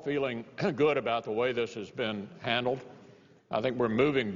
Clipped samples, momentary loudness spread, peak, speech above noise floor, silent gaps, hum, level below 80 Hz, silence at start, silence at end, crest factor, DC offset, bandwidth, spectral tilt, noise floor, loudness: under 0.1%; 9 LU; -12 dBFS; 27 dB; none; none; -64 dBFS; 0 s; 0 s; 18 dB; under 0.1%; 7.4 kHz; -6.5 dB/octave; -57 dBFS; -31 LUFS